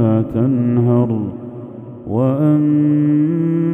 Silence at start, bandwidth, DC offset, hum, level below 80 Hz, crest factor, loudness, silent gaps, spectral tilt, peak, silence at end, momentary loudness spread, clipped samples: 0 s; 3.5 kHz; under 0.1%; none; -50 dBFS; 14 dB; -16 LUFS; none; -12 dB/octave; -2 dBFS; 0 s; 17 LU; under 0.1%